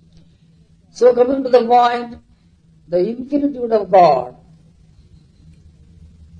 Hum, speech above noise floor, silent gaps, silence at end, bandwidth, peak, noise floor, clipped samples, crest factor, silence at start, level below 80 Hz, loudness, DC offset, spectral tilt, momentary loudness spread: none; 37 dB; none; 2.1 s; 7.6 kHz; 0 dBFS; -51 dBFS; under 0.1%; 18 dB; 0.95 s; -52 dBFS; -15 LUFS; under 0.1%; -6.5 dB/octave; 11 LU